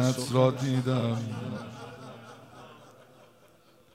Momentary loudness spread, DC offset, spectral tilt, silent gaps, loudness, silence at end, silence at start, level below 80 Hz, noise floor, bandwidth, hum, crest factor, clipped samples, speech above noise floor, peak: 24 LU; under 0.1%; -6.5 dB/octave; none; -28 LUFS; 1.05 s; 0 s; -70 dBFS; -60 dBFS; 15 kHz; none; 20 dB; under 0.1%; 32 dB; -10 dBFS